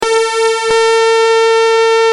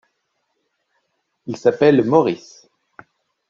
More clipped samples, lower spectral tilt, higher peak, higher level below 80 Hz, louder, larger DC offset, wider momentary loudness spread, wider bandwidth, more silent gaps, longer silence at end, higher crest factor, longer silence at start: neither; second, 0 dB/octave vs -7 dB/octave; about the same, -2 dBFS vs -2 dBFS; first, -54 dBFS vs -64 dBFS; first, -10 LUFS vs -16 LUFS; neither; second, 3 LU vs 18 LU; first, 11.5 kHz vs 7.4 kHz; neither; second, 0 s vs 1.15 s; second, 10 dB vs 20 dB; second, 0 s vs 1.45 s